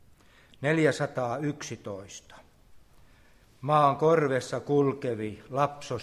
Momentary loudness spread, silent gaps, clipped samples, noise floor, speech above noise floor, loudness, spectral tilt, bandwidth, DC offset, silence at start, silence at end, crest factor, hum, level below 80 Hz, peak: 16 LU; none; under 0.1%; -58 dBFS; 30 dB; -27 LUFS; -6 dB/octave; 12.5 kHz; under 0.1%; 0.6 s; 0 s; 20 dB; none; -62 dBFS; -10 dBFS